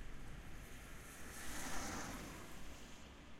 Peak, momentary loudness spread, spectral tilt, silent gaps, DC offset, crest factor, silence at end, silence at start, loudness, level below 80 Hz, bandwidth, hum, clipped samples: -30 dBFS; 10 LU; -3 dB/octave; none; under 0.1%; 18 dB; 0 s; 0 s; -51 LUFS; -56 dBFS; 16 kHz; none; under 0.1%